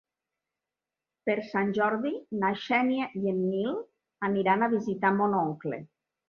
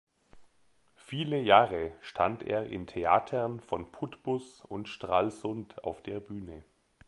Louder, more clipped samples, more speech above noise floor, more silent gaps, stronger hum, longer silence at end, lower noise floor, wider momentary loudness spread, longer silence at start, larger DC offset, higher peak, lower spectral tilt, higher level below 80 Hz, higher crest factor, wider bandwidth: first, -28 LUFS vs -31 LUFS; neither; first, 62 dB vs 39 dB; neither; neither; about the same, 0.45 s vs 0.45 s; first, -90 dBFS vs -69 dBFS; second, 9 LU vs 17 LU; first, 1.25 s vs 0.35 s; neither; second, -10 dBFS vs -6 dBFS; about the same, -7.5 dB/octave vs -6.5 dB/octave; second, -72 dBFS vs -60 dBFS; second, 20 dB vs 26 dB; second, 6.6 kHz vs 11.5 kHz